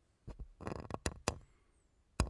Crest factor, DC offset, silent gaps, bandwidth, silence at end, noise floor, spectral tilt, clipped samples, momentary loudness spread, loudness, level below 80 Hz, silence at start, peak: 30 dB; under 0.1%; none; 11.5 kHz; 0 s; -72 dBFS; -4.5 dB/octave; under 0.1%; 15 LU; -44 LUFS; -48 dBFS; 0.25 s; -14 dBFS